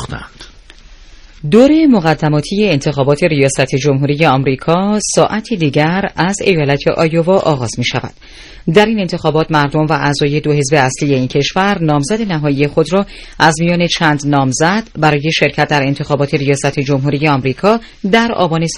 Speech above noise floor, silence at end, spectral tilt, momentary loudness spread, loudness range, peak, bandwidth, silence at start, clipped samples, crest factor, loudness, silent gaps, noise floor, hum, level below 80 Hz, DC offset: 25 dB; 0 s; -5.5 dB/octave; 4 LU; 2 LU; 0 dBFS; 11 kHz; 0 s; 0.5%; 12 dB; -13 LUFS; none; -38 dBFS; none; -38 dBFS; under 0.1%